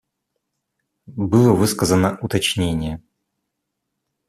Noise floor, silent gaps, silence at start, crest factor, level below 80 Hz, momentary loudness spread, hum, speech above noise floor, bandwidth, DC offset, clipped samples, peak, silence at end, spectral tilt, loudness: -78 dBFS; none; 1.1 s; 18 dB; -46 dBFS; 14 LU; none; 60 dB; 14.5 kHz; under 0.1%; under 0.1%; -2 dBFS; 1.3 s; -5.5 dB/octave; -18 LUFS